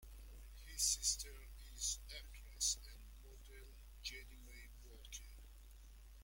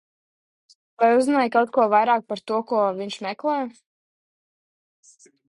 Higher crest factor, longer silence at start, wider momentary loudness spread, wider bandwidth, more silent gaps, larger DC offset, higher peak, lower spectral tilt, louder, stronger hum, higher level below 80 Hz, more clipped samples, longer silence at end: first, 26 dB vs 18 dB; second, 0 s vs 1 s; first, 23 LU vs 10 LU; first, 16.5 kHz vs 11.5 kHz; neither; neither; second, -22 dBFS vs -6 dBFS; second, 0.5 dB/octave vs -5 dB/octave; second, -42 LUFS vs -21 LUFS; neither; first, -56 dBFS vs -74 dBFS; neither; second, 0 s vs 1.8 s